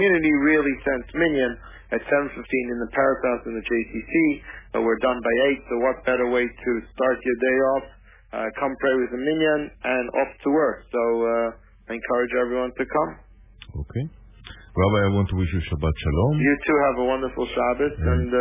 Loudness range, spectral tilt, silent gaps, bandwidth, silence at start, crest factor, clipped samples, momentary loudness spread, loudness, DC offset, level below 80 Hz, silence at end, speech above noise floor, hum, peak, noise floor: 3 LU; -10.5 dB/octave; none; 3.8 kHz; 0 s; 14 dB; under 0.1%; 10 LU; -23 LUFS; under 0.1%; -38 dBFS; 0 s; 21 dB; none; -8 dBFS; -44 dBFS